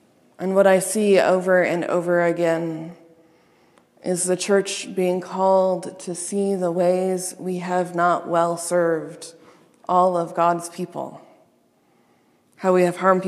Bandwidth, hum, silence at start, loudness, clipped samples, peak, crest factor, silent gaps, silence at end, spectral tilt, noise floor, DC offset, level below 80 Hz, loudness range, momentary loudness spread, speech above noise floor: 13.5 kHz; none; 0.4 s; -21 LUFS; under 0.1%; -2 dBFS; 20 dB; none; 0 s; -5 dB/octave; -61 dBFS; under 0.1%; -78 dBFS; 5 LU; 13 LU; 41 dB